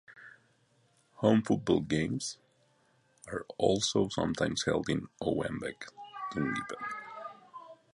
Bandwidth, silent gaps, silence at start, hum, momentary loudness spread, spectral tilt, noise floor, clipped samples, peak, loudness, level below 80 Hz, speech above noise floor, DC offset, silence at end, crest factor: 11.5 kHz; none; 0.1 s; none; 19 LU; -5 dB/octave; -69 dBFS; under 0.1%; -10 dBFS; -32 LUFS; -60 dBFS; 38 dB; under 0.1%; 0.2 s; 22 dB